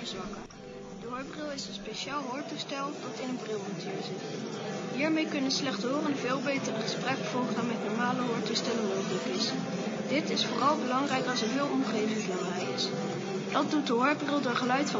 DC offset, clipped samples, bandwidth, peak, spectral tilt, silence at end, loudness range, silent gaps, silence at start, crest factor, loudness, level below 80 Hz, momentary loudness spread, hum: under 0.1%; under 0.1%; 7.8 kHz; -12 dBFS; -4 dB/octave; 0 s; 6 LU; none; 0 s; 20 dB; -31 LUFS; -66 dBFS; 9 LU; none